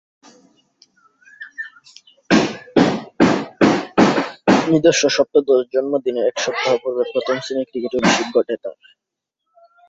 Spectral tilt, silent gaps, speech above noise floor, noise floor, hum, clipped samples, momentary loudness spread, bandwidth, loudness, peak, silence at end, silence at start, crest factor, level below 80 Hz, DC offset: -4.5 dB/octave; none; 60 dB; -78 dBFS; none; under 0.1%; 12 LU; 8 kHz; -17 LUFS; 0 dBFS; 1.2 s; 1.4 s; 18 dB; -56 dBFS; under 0.1%